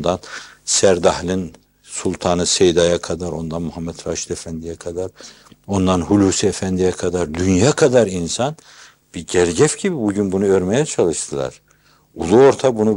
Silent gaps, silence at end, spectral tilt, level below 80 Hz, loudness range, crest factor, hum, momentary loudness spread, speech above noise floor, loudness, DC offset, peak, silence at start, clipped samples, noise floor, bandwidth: none; 0 s; -4.5 dB/octave; -48 dBFS; 4 LU; 16 dB; none; 14 LU; 37 dB; -17 LUFS; under 0.1%; -2 dBFS; 0 s; under 0.1%; -54 dBFS; 16.5 kHz